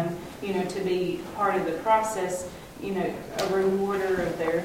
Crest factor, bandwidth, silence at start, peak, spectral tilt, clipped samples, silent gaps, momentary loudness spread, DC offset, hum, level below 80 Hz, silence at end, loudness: 16 dB; 16.5 kHz; 0 s; -10 dBFS; -5 dB/octave; under 0.1%; none; 9 LU; under 0.1%; none; -54 dBFS; 0 s; -27 LUFS